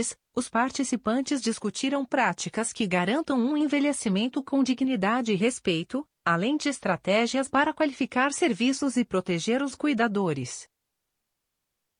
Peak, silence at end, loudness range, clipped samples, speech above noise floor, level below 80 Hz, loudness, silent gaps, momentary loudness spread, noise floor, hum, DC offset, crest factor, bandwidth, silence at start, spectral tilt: -10 dBFS; 1.35 s; 2 LU; under 0.1%; 56 dB; -66 dBFS; -26 LUFS; none; 5 LU; -82 dBFS; none; under 0.1%; 16 dB; 10.5 kHz; 0 s; -4.5 dB/octave